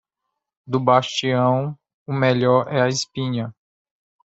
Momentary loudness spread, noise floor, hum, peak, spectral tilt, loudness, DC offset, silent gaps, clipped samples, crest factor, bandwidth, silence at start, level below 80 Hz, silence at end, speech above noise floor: 11 LU; -80 dBFS; none; -2 dBFS; -5.5 dB/octave; -20 LUFS; under 0.1%; 1.94-2.06 s; under 0.1%; 20 dB; 8 kHz; 0.65 s; -62 dBFS; 0.8 s; 61 dB